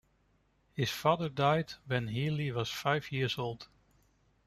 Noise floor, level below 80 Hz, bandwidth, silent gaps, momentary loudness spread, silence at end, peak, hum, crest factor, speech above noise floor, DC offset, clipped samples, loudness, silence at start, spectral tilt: -71 dBFS; -64 dBFS; 15 kHz; none; 7 LU; 0.8 s; -14 dBFS; none; 20 dB; 39 dB; under 0.1%; under 0.1%; -33 LUFS; 0.75 s; -5.5 dB/octave